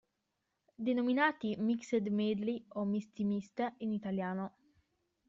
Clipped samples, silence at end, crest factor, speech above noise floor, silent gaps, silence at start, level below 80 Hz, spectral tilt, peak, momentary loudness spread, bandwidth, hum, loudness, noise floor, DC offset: under 0.1%; 0.8 s; 20 dB; 50 dB; none; 0.8 s; -76 dBFS; -5 dB/octave; -16 dBFS; 8 LU; 7.6 kHz; none; -35 LUFS; -85 dBFS; under 0.1%